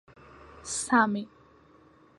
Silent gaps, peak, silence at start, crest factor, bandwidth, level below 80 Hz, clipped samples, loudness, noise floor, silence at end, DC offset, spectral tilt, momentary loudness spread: none; -8 dBFS; 0.55 s; 22 dB; 11.5 kHz; -64 dBFS; under 0.1%; -27 LUFS; -58 dBFS; 0.9 s; under 0.1%; -3.5 dB/octave; 21 LU